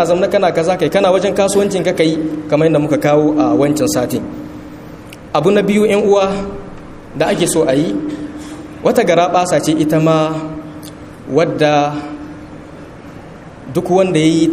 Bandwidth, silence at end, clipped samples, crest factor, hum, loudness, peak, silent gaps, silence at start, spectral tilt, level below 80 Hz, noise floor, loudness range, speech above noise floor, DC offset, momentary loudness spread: 15.5 kHz; 0 s; under 0.1%; 14 dB; none; -14 LUFS; 0 dBFS; none; 0 s; -5.5 dB/octave; -44 dBFS; -33 dBFS; 4 LU; 21 dB; under 0.1%; 21 LU